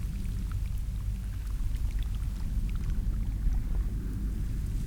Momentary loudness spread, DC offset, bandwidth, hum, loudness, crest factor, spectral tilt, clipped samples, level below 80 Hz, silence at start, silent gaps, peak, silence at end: 3 LU; 0.3%; 16 kHz; none; -35 LUFS; 14 dB; -7 dB/octave; under 0.1%; -30 dBFS; 0 s; none; -18 dBFS; 0 s